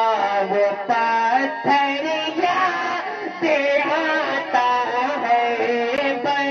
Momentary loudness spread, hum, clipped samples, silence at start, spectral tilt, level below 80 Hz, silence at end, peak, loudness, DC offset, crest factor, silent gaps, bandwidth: 4 LU; none; under 0.1%; 0 s; -4 dB/octave; -70 dBFS; 0 s; -6 dBFS; -20 LUFS; under 0.1%; 14 dB; none; 7.2 kHz